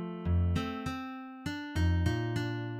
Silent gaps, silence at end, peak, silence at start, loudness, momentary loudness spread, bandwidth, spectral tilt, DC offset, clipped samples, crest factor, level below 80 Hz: none; 0 s; -16 dBFS; 0 s; -33 LUFS; 10 LU; 10.5 kHz; -7 dB/octave; under 0.1%; under 0.1%; 16 dB; -42 dBFS